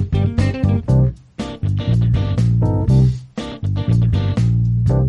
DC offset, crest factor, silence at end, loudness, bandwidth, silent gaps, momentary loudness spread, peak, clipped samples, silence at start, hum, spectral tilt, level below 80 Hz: under 0.1%; 12 dB; 0 s; -17 LUFS; 8 kHz; none; 9 LU; -4 dBFS; under 0.1%; 0 s; none; -8.5 dB/octave; -28 dBFS